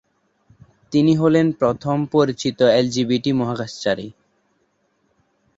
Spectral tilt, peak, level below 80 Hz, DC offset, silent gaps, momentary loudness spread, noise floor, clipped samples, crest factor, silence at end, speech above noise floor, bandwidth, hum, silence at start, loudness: -6.5 dB/octave; -4 dBFS; -56 dBFS; under 0.1%; none; 8 LU; -66 dBFS; under 0.1%; 18 dB; 1.45 s; 48 dB; 8 kHz; none; 0.9 s; -19 LUFS